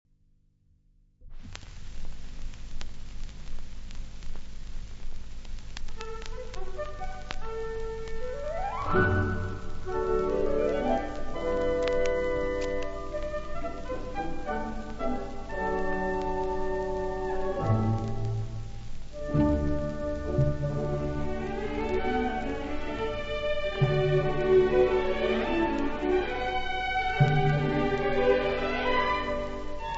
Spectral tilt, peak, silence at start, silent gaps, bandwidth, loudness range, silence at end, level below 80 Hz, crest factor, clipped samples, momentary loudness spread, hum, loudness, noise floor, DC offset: -7 dB/octave; -8 dBFS; 1.2 s; none; 7.8 kHz; 18 LU; 0 s; -36 dBFS; 20 dB; under 0.1%; 20 LU; 50 Hz at -45 dBFS; -29 LUFS; -64 dBFS; under 0.1%